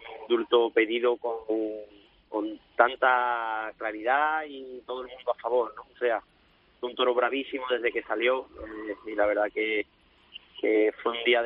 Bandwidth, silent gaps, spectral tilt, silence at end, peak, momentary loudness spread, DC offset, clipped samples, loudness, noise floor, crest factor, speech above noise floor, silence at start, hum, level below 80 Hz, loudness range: 4.7 kHz; none; 0.5 dB/octave; 0 s; -4 dBFS; 14 LU; under 0.1%; under 0.1%; -28 LUFS; -51 dBFS; 24 dB; 24 dB; 0 s; none; -64 dBFS; 3 LU